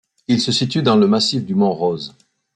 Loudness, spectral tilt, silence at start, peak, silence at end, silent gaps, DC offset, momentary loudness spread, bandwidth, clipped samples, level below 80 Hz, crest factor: -17 LUFS; -5.5 dB/octave; 0.3 s; -4 dBFS; 0.45 s; none; under 0.1%; 8 LU; 9.4 kHz; under 0.1%; -58 dBFS; 14 dB